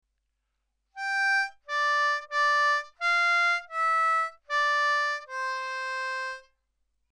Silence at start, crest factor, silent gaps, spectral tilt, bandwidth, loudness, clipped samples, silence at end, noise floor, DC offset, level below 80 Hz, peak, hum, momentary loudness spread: 0.95 s; 10 dB; none; 4 dB/octave; 12.5 kHz; -26 LUFS; under 0.1%; 0.7 s; -79 dBFS; under 0.1%; -76 dBFS; -18 dBFS; none; 9 LU